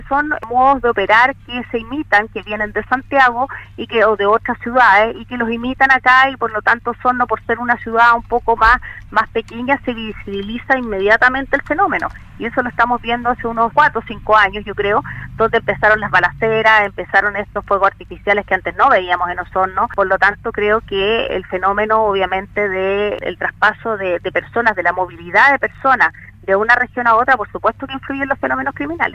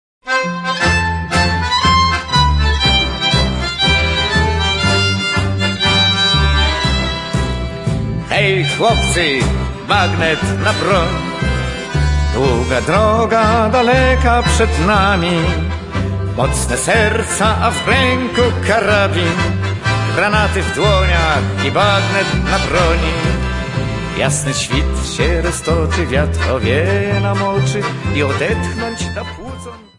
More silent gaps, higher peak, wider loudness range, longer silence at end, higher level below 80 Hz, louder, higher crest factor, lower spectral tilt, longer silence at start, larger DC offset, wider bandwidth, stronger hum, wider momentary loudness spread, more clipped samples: neither; about the same, 0 dBFS vs 0 dBFS; about the same, 3 LU vs 3 LU; second, 0 s vs 0.15 s; second, -40 dBFS vs -24 dBFS; about the same, -15 LUFS vs -14 LUFS; about the same, 16 dB vs 14 dB; about the same, -5.5 dB/octave vs -4.5 dB/octave; second, 0 s vs 0.25 s; neither; second, 10 kHz vs 11.5 kHz; neither; first, 10 LU vs 7 LU; neither